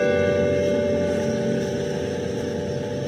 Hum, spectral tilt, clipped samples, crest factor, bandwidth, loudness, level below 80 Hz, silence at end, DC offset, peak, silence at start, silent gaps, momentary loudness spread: none; -6 dB/octave; under 0.1%; 14 dB; 13.5 kHz; -23 LUFS; -52 dBFS; 0 s; under 0.1%; -10 dBFS; 0 s; none; 6 LU